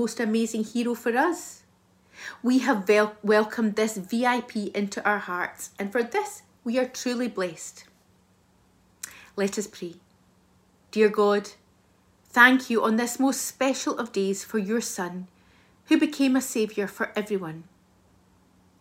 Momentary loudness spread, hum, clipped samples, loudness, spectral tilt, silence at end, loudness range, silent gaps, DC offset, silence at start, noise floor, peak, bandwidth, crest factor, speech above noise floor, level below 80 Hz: 16 LU; none; under 0.1%; -25 LUFS; -4 dB/octave; 1.2 s; 9 LU; none; under 0.1%; 0 s; -62 dBFS; -2 dBFS; 16 kHz; 24 dB; 37 dB; -72 dBFS